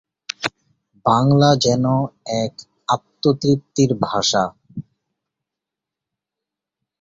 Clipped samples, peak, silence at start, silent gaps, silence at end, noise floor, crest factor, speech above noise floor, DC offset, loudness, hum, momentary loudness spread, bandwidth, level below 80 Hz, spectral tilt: under 0.1%; -2 dBFS; 0.4 s; none; 2.2 s; -85 dBFS; 20 dB; 68 dB; under 0.1%; -19 LUFS; none; 16 LU; 7.8 kHz; -54 dBFS; -5.5 dB/octave